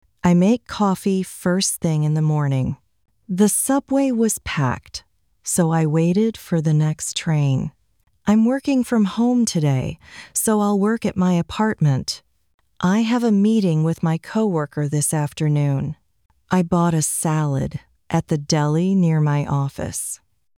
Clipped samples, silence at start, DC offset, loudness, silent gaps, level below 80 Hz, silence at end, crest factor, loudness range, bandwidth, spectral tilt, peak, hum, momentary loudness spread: under 0.1%; 0.25 s; under 0.1%; -20 LUFS; 12.54-12.58 s; -50 dBFS; 0.4 s; 16 dB; 2 LU; 16.5 kHz; -6 dB/octave; -4 dBFS; none; 9 LU